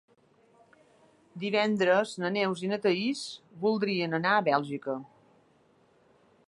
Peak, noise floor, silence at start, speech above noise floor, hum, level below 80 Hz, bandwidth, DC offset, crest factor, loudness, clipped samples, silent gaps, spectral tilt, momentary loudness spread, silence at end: -10 dBFS; -64 dBFS; 1.35 s; 36 dB; none; -78 dBFS; 11.5 kHz; under 0.1%; 20 dB; -28 LUFS; under 0.1%; none; -5.5 dB/octave; 12 LU; 1.4 s